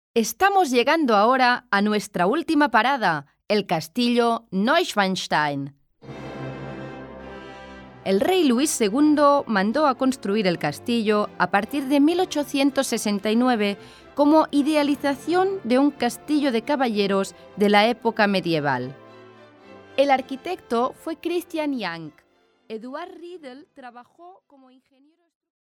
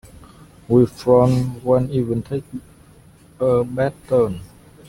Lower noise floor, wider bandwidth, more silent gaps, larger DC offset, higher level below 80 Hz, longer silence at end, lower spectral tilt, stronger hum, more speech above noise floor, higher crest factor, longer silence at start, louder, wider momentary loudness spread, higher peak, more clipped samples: about the same, -48 dBFS vs -48 dBFS; first, 18 kHz vs 15.5 kHz; neither; neither; second, -62 dBFS vs -46 dBFS; first, 1.45 s vs 0.4 s; second, -4.5 dB/octave vs -8.5 dB/octave; neither; second, 26 dB vs 30 dB; about the same, 18 dB vs 18 dB; second, 0.15 s vs 0.7 s; about the same, -21 LUFS vs -19 LUFS; first, 18 LU vs 13 LU; about the same, -4 dBFS vs -2 dBFS; neither